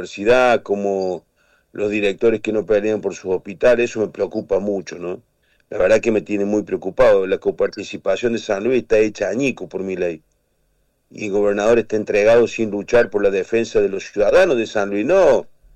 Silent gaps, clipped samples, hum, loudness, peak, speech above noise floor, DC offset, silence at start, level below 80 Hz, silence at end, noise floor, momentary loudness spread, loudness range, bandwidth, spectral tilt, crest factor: none; under 0.1%; none; -18 LUFS; -6 dBFS; 46 dB; under 0.1%; 0 s; -44 dBFS; 0.3 s; -64 dBFS; 11 LU; 4 LU; 9.4 kHz; -5.5 dB/octave; 12 dB